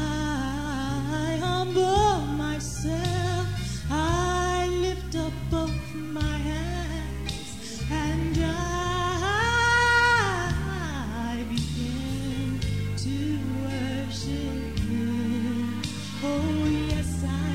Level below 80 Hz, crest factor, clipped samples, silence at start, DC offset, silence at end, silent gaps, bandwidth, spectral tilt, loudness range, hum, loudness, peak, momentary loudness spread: -36 dBFS; 16 dB; under 0.1%; 0 s; 0.7%; 0 s; none; 16 kHz; -5 dB/octave; 6 LU; none; -27 LUFS; -10 dBFS; 9 LU